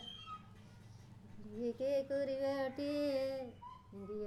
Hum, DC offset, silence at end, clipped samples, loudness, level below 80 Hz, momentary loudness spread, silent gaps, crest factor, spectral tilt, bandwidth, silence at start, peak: none; under 0.1%; 0 s; under 0.1%; -39 LUFS; -70 dBFS; 21 LU; none; 14 dB; -6 dB/octave; 13 kHz; 0 s; -28 dBFS